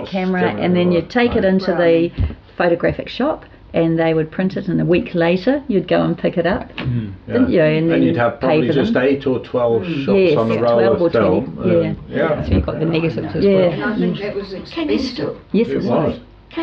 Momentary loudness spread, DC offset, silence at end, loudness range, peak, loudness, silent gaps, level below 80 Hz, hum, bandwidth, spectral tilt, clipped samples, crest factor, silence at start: 8 LU; under 0.1%; 0 s; 3 LU; -4 dBFS; -17 LUFS; none; -36 dBFS; none; 6.8 kHz; -8.5 dB/octave; under 0.1%; 12 dB; 0 s